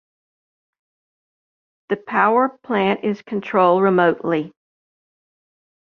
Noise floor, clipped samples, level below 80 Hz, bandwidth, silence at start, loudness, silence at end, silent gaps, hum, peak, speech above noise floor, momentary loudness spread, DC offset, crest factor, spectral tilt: under -90 dBFS; under 0.1%; -68 dBFS; 6.4 kHz; 1.9 s; -19 LUFS; 1.45 s; none; none; -2 dBFS; over 72 dB; 11 LU; under 0.1%; 18 dB; -8 dB/octave